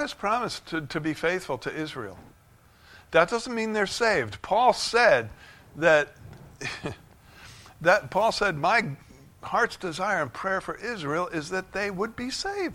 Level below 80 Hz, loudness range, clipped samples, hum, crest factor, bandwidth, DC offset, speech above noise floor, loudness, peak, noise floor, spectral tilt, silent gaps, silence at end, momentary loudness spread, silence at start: -56 dBFS; 5 LU; under 0.1%; none; 22 dB; 16.5 kHz; under 0.1%; 31 dB; -26 LUFS; -4 dBFS; -57 dBFS; -4 dB/octave; none; 0 s; 15 LU; 0 s